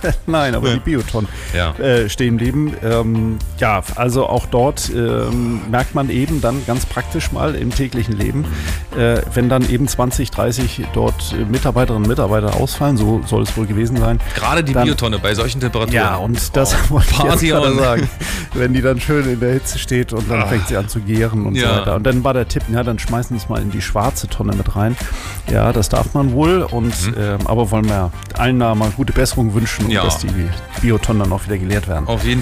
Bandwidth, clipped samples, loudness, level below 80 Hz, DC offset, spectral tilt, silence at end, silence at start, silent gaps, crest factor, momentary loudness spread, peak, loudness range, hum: 16 kHz; under 0.1%; -17 LUFS; -24 dBFS; under 0.1%; -5.5 dB/octave; 0 s; 0 s; none; 12 dB; 5 LU; -4 dBFS; 3 LU; none